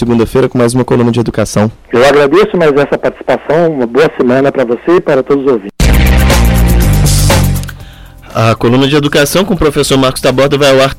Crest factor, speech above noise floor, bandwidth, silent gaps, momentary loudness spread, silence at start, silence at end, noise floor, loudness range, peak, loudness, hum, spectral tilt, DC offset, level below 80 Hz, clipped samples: 8 dB; 22 dB; 17 kHz; none; 5 LU; 0 s; 0 s; -31 dBFS; 1 LU; 0 dBFS; -9 LUFS; none; -5.5 dB/octave; under 0.1%; -16 dBFS; under 0.1%